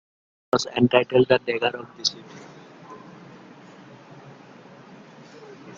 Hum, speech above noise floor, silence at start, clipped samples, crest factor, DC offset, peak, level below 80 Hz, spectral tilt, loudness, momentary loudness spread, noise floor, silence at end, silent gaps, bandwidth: none; 25 dB; 0.55 s; under 0.1%; 24 dB; under 0.1%; -2 dBFS; -64 dBFS; -4.5 dB/octave; -22 LUFS; 27 LU; -47 dBFS; 0.05 s; none; 7.6 kHz